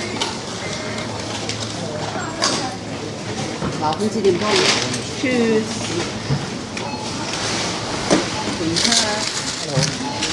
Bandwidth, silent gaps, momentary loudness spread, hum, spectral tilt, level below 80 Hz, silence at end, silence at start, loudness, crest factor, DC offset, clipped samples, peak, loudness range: 11.5 kHz; none; 10 LU; none; -3.5 dB/octave; -48 dBFS; 0 s; 0 s; -20 LUFS; 20 dB; under 0.1%; under 0.1%; 0 dBFS; 4 LU